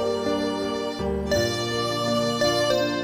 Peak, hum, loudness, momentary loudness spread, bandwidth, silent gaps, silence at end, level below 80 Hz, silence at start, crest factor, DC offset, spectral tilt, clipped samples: -8 dBFS; none; -24 LUFS; 6 LU; over 20 kHz; none; 0 s; -44 dBFS; 0 s; 16 dB; under 0.1%; -4.5 dB/octave; under 0.1%